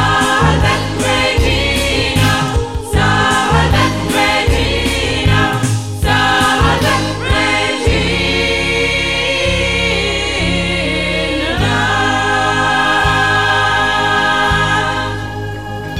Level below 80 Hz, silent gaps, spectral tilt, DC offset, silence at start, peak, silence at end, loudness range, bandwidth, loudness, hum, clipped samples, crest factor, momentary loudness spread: -24 dBFS; none; -4 dB/octave; 0.9%; 0 s; 0 dBFS; 0 s; 2 LU; 16 kHz; -13 LUFS; none; under 0.1%; 14 dB; 4 LU